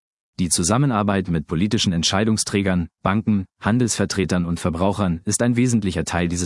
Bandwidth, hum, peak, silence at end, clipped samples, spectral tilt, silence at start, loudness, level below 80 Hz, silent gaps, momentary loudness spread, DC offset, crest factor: 12 kHz; none; -2 dBFS; 0 s; under 0.1%; -4.5 dB/octave; 0.4 s; -20 LUFS; -46 dBFS; none; 4 LU; under 0.1%; 18 dB